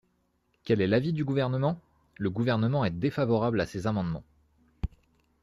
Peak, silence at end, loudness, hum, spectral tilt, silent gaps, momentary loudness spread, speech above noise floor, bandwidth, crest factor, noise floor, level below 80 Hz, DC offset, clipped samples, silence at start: -12 dBFS; 0.55 s; -28 LUFS; none; -8 dB/octave; none; 13 LU; 45 dB; 11.5 kHz; 16 dB; -72 dBFS; -50 dBFS; under 0.1%; under 0.1%; 0.65 s